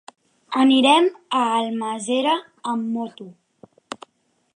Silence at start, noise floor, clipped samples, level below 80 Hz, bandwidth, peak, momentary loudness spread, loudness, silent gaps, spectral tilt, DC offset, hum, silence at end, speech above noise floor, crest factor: 0.5 s; -67 dBFS; under 0.1%; -78 dBFS; 10.5 kHz; -4 dBFS; 22 LU; -20 LUFS; none; -3.5 dB/octave; under 0.1%; none; 0.6 s; 48 dB; 18 dB